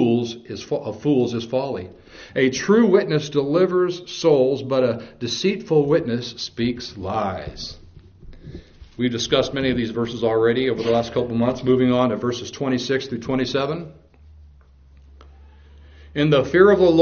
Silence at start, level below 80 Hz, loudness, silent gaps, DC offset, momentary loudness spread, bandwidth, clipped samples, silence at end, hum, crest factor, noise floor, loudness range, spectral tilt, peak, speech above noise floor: 0 s; -48 dBFS; -21 LUFS; none; under 0.1%; 13 LU; 7 kHz; under 0.1%; 0 s; none; 20 dB; -49 dBFS; 7 LU; -5 dB/octave; -2 dBFS; 29 dB